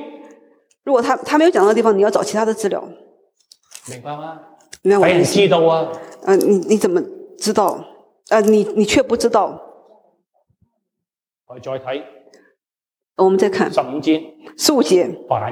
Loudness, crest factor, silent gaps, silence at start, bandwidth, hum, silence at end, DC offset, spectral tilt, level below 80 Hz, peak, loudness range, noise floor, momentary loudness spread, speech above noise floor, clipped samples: -16 LUFS; 16 dB; none; 0 s; 16 kHz; none; 0 s; under 0.1%; -4.5 dB/octave; -58 dBFS; -2 dBFS; 8 LU; -88 dBFS; 18 LU; 72 dB; under 0.1%